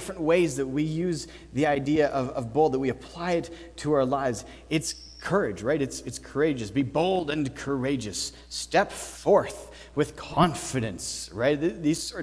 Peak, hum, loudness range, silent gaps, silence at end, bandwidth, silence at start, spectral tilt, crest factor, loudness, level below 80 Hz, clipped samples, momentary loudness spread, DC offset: -6 dBFS; none; 2 LU; none; 0 s; 11 kHz; 0 s; -5 dB/octave; 22 dB; -27 LUFS; -50 dBFS; under 0.1%; 10 LU; under 0.1%